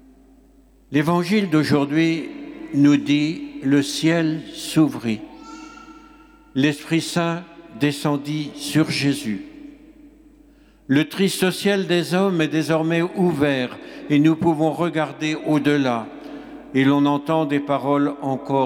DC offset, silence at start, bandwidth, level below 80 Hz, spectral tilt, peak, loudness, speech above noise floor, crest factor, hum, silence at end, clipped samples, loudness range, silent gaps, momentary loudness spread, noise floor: under 0.1%; 0.9 s; 16.5 kHz; -58 dBFS; -6 dB/octave; -6 dBFS; -20 LUFS; 32 dB; 16 dB; none; 0 s; under 0.1%; 5 LU; none; 12 LU; -52 dBFS